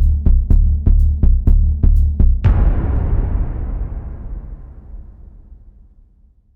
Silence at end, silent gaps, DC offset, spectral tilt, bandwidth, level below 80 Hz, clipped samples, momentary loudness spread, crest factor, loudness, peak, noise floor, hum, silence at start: 1 s; none; under 0.1%; -11 dB/octave; 2.8 kHz; -16 dBFS; under 0.1%; 21 LU; 12 dB; -17 LUFS; -2 dBFS; -51 dBFS; none; 0 s